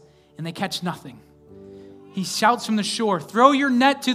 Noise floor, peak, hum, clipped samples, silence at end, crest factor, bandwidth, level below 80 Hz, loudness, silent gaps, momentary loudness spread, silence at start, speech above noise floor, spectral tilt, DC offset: -44 dBFS; 0 dBFS; none; under 0.1%; 0 s; 22 dB; 16 kHz; -68 dBFS; -21 LUFS; none; 18 LU; 0.4 s; 23 dB; -4 dB/octave; under 0.1%